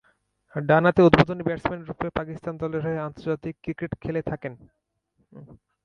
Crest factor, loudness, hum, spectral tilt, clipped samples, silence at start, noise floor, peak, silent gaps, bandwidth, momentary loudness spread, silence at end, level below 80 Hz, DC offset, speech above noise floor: 24 dB; -24 LUFS; none; -8.5 dB/octave; under 0.1%; 0.55 s; -71 dBFS; 0 dBFS; none; 7.2 kHz; 16 LU; 0.3 s; -50 dBFS; under 0.1%; 47 dB